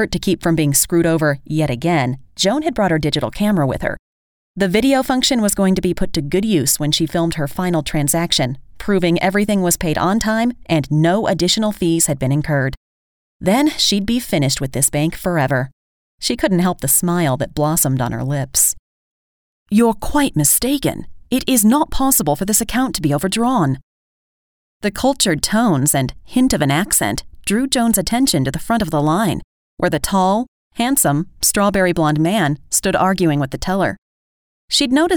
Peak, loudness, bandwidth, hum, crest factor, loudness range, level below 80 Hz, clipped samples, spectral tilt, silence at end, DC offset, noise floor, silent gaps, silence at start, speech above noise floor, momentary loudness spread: 0 dBFS; -17 LUFS; over 20 kHz; none; 16 dB; 2 LU; -38 dBFS; under 0.1%; -4 dB/octave; 0 s; under 0.1%; under -90 dBFS; 3.99-4.54 s, 12.77-13.40 s, 15.73-16.18 s, 18.79-19.66 s, 23.83-24.80 s, 29.44-29.77 s, 30.48-30.71 s, 33.98-34.68 s; 0 s; over 74 dB; 7 LU